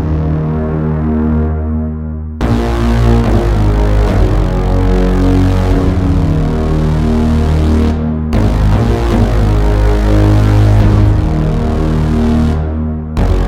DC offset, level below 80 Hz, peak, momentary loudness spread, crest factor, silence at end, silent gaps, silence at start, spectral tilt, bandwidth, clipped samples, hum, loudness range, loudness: under 0.1%; -14 dBFS; 0 dBFS; 6 LU; 10 dB; 0 s; none; 0 s; -8.5 dB/octave; 10.5 kHz; under 0.1%; none; 2 LU; -12 LUFS